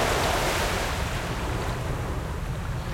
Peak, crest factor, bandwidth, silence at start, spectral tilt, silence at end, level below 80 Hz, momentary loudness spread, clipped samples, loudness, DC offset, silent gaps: -12 dBFS; 14 dB; 16.5 kHz; 0 s; -4 dB/octave; 0 s; -34 dBFS; 8 LU; under 0.1%; -28 LUFS; under 0.1%; none